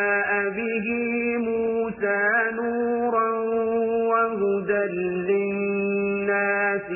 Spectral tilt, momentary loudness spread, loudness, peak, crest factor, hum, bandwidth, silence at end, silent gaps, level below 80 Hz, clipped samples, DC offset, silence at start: -11 dB/octave; 4 LU; -23 LUFS; -10 dBFS; 14 dB; none; 3 kHz; 0 s; none; -60 dBFS; under 0.1%; under 0.1%; 0 s